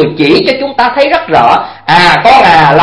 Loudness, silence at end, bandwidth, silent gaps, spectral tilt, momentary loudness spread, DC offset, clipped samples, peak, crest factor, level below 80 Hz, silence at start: -6 LUFS; 0 s; 11 kHz; none; -5.5 dB/octave; 7 LU; under 0.1%; 4%; 0 dBFS; 6 dB; -38 dBFS; 0 s